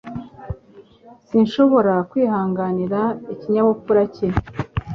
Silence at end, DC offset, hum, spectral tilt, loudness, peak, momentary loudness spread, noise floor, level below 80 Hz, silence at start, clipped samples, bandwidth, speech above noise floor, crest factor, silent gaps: 0 s; under 0.1%; none; -9 dB/octave; -19 LUFS; -2 dBFS; 19 LU; -48 dBFS; -40 dBFS; 0.05 s; under 0.1%; 6.6 kHz; 30 dB; 18 dB; none